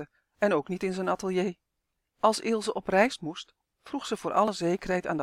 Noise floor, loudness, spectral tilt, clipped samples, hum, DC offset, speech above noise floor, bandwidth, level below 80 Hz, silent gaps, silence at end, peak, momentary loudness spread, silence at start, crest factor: -82 dBFS; -29 LUFS; -5 dB/octave; under 0.1%; none; under 0.1%; 54 dB; 15.5 kHz; -60 dBFS; none; 0 s; -8 dBFS; 13 LU; 0 s; 22 dB